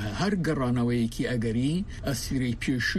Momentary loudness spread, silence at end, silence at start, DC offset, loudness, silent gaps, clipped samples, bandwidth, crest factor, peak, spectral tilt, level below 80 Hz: 4 LU; 0 s; 0 s; under 0.1%; -28 LUFS; none; under 0.1%; 13.5 kHz; 12 dB; -14 dBFS; -5.5 dB/octave; -42 dBFS